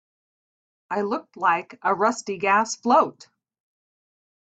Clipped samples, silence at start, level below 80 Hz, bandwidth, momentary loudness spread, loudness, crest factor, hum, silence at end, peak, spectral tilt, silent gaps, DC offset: under 0.1%; 0.9 s; -74 dBFS; 9 kHz; 8 LU; -23 LUFS; 20 dB; none; 1.4 s; -6 dBFS; -3.5 dB/octave; none; under 0.1%